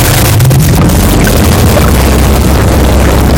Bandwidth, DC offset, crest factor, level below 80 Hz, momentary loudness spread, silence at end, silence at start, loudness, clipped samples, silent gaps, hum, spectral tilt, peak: 17.5 kHz; 0.7%; 6 dB; -10 dBFS; 1 LU; 0 s; 0 s; -6 LUFS; 0.9%; none; none; -5.5 dB/octave; 0 dBFS